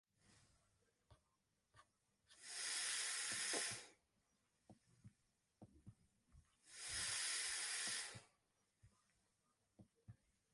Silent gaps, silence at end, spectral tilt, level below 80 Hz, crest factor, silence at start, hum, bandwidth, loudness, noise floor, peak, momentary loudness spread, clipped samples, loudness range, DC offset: none; 0.4 s; 0.5 dB/octave; -80 dBFS; 22 dB; 1.1 s; none; 16 kHz; -44 LUFS; -86 dBFS; -30 dBFS; 16 LU; under 0.1%; 5 LU; under 0.1%